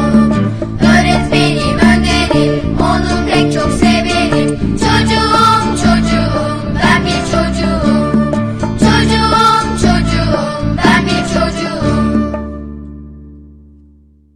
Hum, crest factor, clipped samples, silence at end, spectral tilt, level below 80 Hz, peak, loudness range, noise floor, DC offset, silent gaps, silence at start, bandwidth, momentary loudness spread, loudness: none; 12 dB; under 0.1%; 0.9 s; -5.5 dB/octave; -24 dBFS; 0 dBFS; 3 LU; -45 dBFS; under 0.1%; none; 0 s; 13.5 kHz; 7 LU; -12 LUFS